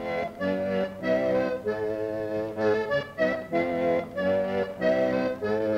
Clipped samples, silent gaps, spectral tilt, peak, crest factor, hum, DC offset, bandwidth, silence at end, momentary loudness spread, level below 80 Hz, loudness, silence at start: under 0.1%; none; -7 dB/octave; -12 dBFS; 14 dB; none; under 0.1%; 15.5 kHz; 0 s; 5 LU; -58 dBFS; -27 LUFS; 0 s